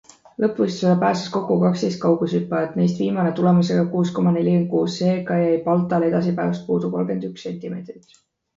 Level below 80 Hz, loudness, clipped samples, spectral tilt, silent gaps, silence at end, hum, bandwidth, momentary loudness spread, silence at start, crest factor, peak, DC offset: -62 dBFS; -20 LUFS; under 0.1%; -7.5 dB/octave; none; 0.6 s; none; 7.6 kHz; 10 LU; 0.4 s; 14 dB; -6 dBFS; under 0.1%